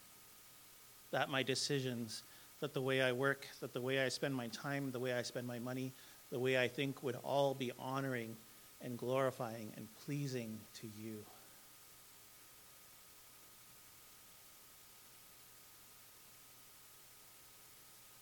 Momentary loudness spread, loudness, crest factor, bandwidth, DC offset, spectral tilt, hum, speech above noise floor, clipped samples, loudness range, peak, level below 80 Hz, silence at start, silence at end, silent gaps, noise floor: 21 LU; -41 LUFS; 24 dB; 19 kHz; under 0.1%; -4.5 dB/octave; none; 21 dB; under 0.1%; 18 LU; -20 dBFS; -82 dBFS; 0 s; 0 s; none; -61 dBFS